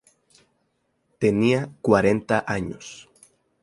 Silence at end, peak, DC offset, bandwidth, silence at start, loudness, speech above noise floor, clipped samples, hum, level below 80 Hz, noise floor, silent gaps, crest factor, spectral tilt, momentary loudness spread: 0.6 s; -2 dBFS; under 0.1%; 11.5 kHz; 1.2 s; -22 LUFS; 49 dB; under 0.1%; none; -54 dBFS; -71 dBFS; none; 22 dB; -6.5 dB/octave; 19 LU